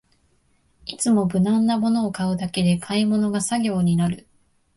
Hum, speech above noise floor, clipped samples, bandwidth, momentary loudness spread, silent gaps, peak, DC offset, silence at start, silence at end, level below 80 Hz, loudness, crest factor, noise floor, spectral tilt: none; 42 dB; under 0.1%; 11.5 kHz; 6 LU; none; -8 dBFS; under 0.1%; 0.85 s; 0.55 s; -54 dBFS; -21 LUFS; 12 dB; -63 dBFS; -5.5 dB/octave